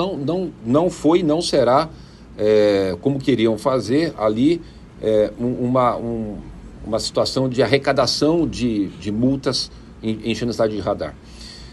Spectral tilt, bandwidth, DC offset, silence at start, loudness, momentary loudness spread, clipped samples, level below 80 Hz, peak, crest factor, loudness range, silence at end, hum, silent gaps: -5.5 dB/octave; 12.5 kHz; under 0.1%; 0 s; -19 LUFS; 12 LU; under 0.1%; -44 dBFS; -2 dBFS; 18 dB; 3 LU; 0 s; none; none